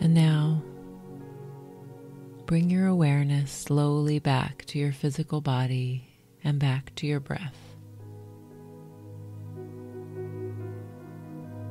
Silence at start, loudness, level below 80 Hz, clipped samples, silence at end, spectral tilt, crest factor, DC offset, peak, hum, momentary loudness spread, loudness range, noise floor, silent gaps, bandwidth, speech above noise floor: 0 s; -27 LUFS; -58 dBFS; under 0.1%; 0 s; -7 dB/octave; 18 dB; under 0.1%; -10 dBFS; none; 22 LU; 15 LU; -46 dBFS; none; 12.5 kHz; 21 dB